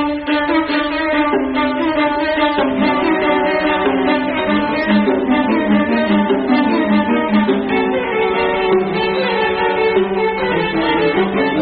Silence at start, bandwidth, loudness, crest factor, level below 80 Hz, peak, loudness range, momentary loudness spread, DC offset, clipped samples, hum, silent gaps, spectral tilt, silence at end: 0 s; 5 kHz; -15 LUFS; 12 dB; -42 dBFS; -4 dBFS; 1 LU; 2 LU; under 0.1%; under 0.1%; none; none; -3.5 dB/octave; 0 s